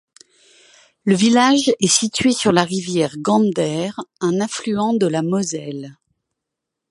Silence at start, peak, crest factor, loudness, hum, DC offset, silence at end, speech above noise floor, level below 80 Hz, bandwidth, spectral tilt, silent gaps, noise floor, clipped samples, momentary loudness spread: 1.05 s; 0 dBFS; 18 dB; -18 LUFS; none; under 0.1%; 1 s; 64 dB; -58 dBFS; 11.5 kHz; -4 dB/octave; none; -82 dBFS; under 0.1%; 12 LU